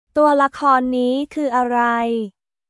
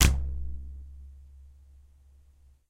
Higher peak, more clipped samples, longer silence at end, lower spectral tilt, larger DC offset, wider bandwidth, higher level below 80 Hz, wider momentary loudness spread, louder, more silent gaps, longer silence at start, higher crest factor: about the same, -4 dBFS vs -2 dBFS; neither; second, 0.4 s vs 1.2 s; first, -5 dB/octave vs -3.5 dB/octave; neither; second, 11.5 kHz vs 16 kHz; second, -58 dBFS vs -34 dBFS; second, 7 LU vs 24 LU; first, -18 LUFS vs -33 LUFS; neither; first, 0.15 s vs 0 s; second, 14 dB vs 28 dB